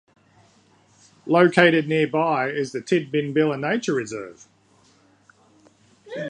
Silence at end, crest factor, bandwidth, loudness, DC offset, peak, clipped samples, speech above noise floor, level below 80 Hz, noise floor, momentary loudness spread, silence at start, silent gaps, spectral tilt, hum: 0 s; 24 dB; 10 kHz; -21 LUFS; under 0.1%; 0 dBFS; under 0.1%; 37 dB; -70 dBFS; -58 dBFS; 18 LU; 1.25 s; none; -6 dB/octave; none